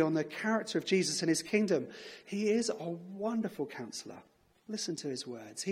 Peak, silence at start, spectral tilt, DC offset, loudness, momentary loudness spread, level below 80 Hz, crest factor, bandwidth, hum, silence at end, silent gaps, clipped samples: -14 dBFS; 0 s; -4 dB/octave; under 0.1%; -34 LUFS; 13 LU; -78 dBFS; 20 dB; 15.5 kHz; none; 0 s; none; under 0.1%